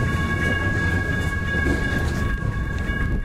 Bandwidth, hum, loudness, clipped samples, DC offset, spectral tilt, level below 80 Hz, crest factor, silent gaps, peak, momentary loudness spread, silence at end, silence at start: 15.5 kHz; none; -23 LUFS; under 0.1%; under 0.1%; -6 dB/octave; -28 dBFS; 12 dB; none; -10 dBFS; 4 LU; 0 s; 0 s